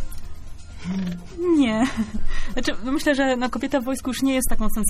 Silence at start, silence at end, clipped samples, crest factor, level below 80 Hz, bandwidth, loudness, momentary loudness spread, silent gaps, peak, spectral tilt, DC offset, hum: 0 s; 0 s; under 0.1%; 14 dB; -28 dBFS; 15 kHz; -23 LUFS; 18 LU; none; -6 dBFS; -4.5 dB/octave; under 0.1%; none